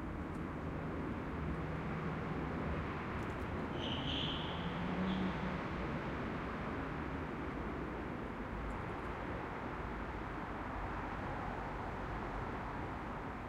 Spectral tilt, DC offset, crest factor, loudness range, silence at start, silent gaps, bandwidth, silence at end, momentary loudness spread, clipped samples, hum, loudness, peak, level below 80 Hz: -7 dB/octave; under 0.1%; 14 dB; 4 LU; 0 s; none; 12.5 kHz; 0 s; 5 LU; under 0.1%; none; -41 LUFS; -26 dBFS; -50 dBFS